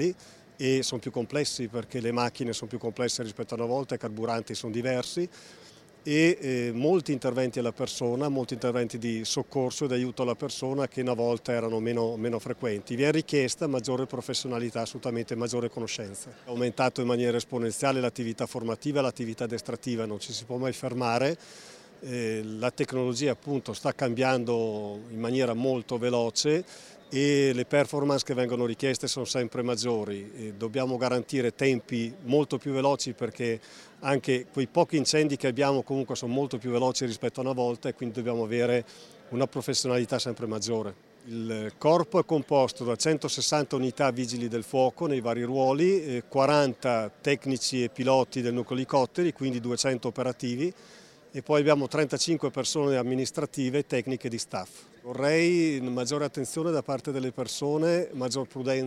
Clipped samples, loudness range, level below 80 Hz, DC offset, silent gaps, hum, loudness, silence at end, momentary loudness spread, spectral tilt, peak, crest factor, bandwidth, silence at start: under 0.1%; 4 LU; -68 dBFS; under 0.1%; none; none; -28 LUFS; 0 s; 9 LU; -5 dB/octave; -8 dBFS; 20 dB; 15 kHz; 0 s